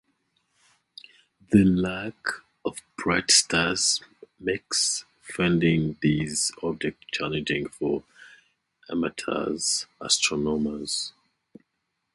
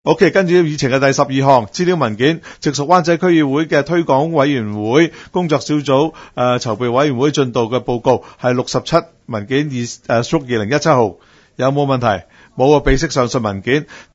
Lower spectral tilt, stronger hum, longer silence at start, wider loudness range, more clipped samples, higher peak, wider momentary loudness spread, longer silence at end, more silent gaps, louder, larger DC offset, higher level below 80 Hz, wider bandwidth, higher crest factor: second, -3.5 dB/octave vs -5.5 dB/octave; neither; first, 1.5 s vs 0.05 s; first, 6 LU vs 3 LU; neither; second, -4 dBFS vs 0 dBFS; first, 13 LU vs 6 LU; first, 1.05 s vs 0.1 s; neither; second, -25 LUFS vs -15 LUFS; neither; second, -52 dBFS vs -36 dBFS; first, 11.5 kHz vs 8 kHz; first, 22 dB vs 14 dB